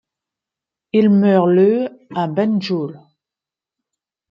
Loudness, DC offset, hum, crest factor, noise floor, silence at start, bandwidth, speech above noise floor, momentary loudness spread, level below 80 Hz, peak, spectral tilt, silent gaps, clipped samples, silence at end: -16 LUFS; under 0.1%; none; 16 dB; -88 dBFS; 0.95 s; 6.2 kHz; 73 dB; 11 LU; -66 dBFS; -2 dBFS; -9 dB/octave; none; under 0.1%; 1.35 s